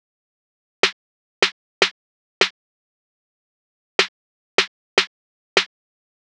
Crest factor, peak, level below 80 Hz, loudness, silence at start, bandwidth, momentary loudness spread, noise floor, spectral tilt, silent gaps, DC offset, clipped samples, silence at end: 26 dB; 0 dBFS; -86 dBFS; -21 LUFS; 0.85 s; 12.5 kHz; 2 LU; under -90 dBFS; -1 dB/octave; 0.93-1.42 s, 1.52-1.81 s, 1.91-2.41 s, 2.50-3.99 s, 4.08-4.58 s, 4.68-4.97 s, 5.07-5.56 s; under 0.1%; under 0.1%; 0.65 s